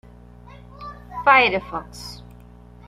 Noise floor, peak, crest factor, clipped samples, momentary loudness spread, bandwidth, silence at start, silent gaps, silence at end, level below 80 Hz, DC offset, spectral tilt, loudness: -45 dBFS; -2 dBFS; 22 dB; under 0.1%; 24 LU; 14 kHz; 0.8 s; none; 0.7 s; -46 dBFS; under 0.1%; -4 dB/octave; -17 LUFS